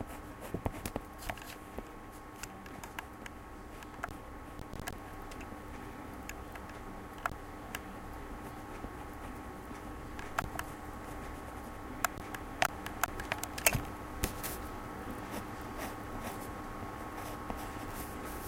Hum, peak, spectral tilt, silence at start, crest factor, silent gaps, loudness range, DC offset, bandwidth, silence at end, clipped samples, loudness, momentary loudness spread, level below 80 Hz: none; -6 dBFS; -3.5 dB/octave; 0 s; 34 dB; none; 10 LU; under 0.1%; 17 kHz; 0 s; under 0.1%; -41 LUFS; 10 LU; -50 dBFS